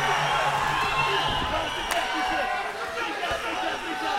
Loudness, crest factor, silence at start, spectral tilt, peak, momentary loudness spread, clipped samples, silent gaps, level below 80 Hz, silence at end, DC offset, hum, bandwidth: -26 LUFS; 18 dB; 0 s; -3 dB/octave; -8 dBFS; 6 LU; under 0.1%; none; -46 dBFS; 0 s; under 0.1%; none; 16.5 kHz